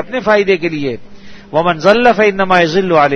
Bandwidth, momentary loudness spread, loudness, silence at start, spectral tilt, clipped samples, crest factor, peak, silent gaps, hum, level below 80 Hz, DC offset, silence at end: 8.2 kHz; 10 LU; -12 LUFS; 0 s; -5.5 dB/octave; 0.3%; 12 dB; 0 dBFS; none; none; -44 dBFS; under 0.1%; 0 s